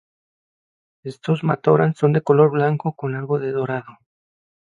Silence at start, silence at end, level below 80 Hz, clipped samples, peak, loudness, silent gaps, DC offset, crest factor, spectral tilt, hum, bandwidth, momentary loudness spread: 1.05 s; 0.75 s; -66 dBFS; under 0.1%; -2 dBFS; -19 LUFS; none; under 0.1%; 18 dB; -9 dB/octave; none; 7.6 kHz; 14 LU